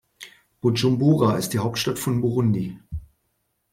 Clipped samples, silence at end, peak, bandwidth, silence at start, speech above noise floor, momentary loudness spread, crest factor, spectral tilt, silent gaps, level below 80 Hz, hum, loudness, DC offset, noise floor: under 0.1%; 0.7 s; -6 dBFS; 16.5 kHz; 0.2 s; 52 dB; 20 LU; 18 dB; -6 dB/octave; none; -48 dBFS; none; -22 LUFS; under 0.1%; -73 dBFS